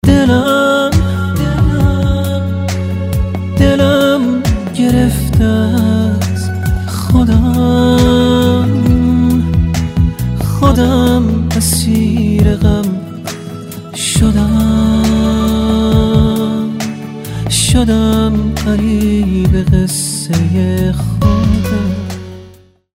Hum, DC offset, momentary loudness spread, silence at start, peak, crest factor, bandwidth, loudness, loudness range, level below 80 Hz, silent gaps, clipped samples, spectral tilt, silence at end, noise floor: none; under 0.1%; 7 LU; 0.05 s; 0 dBFS; 12 dB; 16.5 kHz; -12 LUFS; 2 LU; -22 dBFS; none; 0.1%; -6 dB/octave; 0.45 s; -40 dBFS